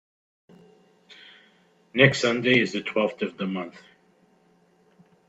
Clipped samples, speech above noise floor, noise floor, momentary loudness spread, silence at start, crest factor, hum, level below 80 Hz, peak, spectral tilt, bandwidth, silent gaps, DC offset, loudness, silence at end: under 0.1%; 38 dB; -62 dBFS; 13 LU; 1.95 s; 26 dB; none; -68 dBFS; -2 dBFS; -5 dB/octave; 8.2 kHz; none; under 0.1%; -23 LUFS; 1.6 s